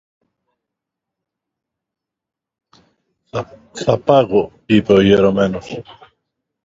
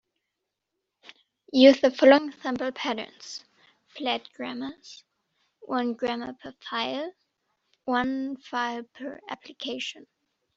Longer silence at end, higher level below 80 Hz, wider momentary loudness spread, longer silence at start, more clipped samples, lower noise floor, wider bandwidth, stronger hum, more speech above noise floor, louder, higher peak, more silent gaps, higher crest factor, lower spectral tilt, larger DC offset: first, 0.7 s vs 0.55 s; first, -48 dBFS vs -70 dBFS; second, 17 LU vs 22 LU; first, 3.35 s vs 1.55 s; neither; about the same, -82 dBFS vs -83 dBFS; about the same, 7.8 kHz vs 7.6 kHz; neither; first, 67 dB vs 58 dB; first, -14 LUFS vs -25 LUFS; first, 0 dBFS vs -4 dBFS; neither; second, 18 dB vs 24 dB; first, -7 dB/octave vs -1 dB/octave; neither